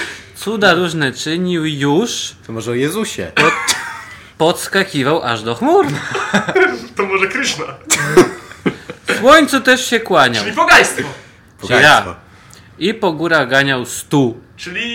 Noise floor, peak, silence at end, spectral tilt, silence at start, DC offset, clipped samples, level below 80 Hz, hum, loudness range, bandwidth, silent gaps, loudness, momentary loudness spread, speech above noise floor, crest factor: -41 dBFS; 0 dBFS; 0 s; -3.5 dB/octave; 0 s; under 0.1%; under 0.1%; -48 dBFS; none; 5 LU; 17 kHz; none; -14 LUFS; 14 LU; 27 dB; 14 dB